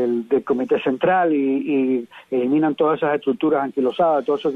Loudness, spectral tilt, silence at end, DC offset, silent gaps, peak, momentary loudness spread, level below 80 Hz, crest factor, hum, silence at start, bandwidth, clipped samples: -20 LUFS; -8 dB/octave; 0 s; under 0.1%; none; -8 dBFS; 4 LU; -66 dBFS; 12 dB; none; 0 s; 4.5 kHz; under 0.1%